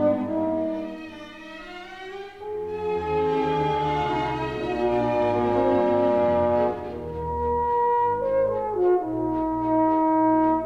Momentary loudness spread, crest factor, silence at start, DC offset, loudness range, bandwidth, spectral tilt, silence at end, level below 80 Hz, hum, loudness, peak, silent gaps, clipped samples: 16 LU; 14 dB; 0 s; 0.2%; 6 LU; 7.8 kHz; -8 dB/octave; 0 s; -46 dBFS; none; -24 LUFS; -10 dBFS; none; under 0.1%